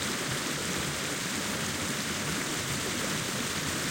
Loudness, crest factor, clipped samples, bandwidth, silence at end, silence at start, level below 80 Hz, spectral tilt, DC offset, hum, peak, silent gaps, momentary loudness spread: -30 LUFS; 16 dB; under 0.1%; 16.5 kHz; 0 s; 0 s; -56 dBFS; -2.5 dB/octave; under 0.1%; none; -16 dBFS; none; 1 LU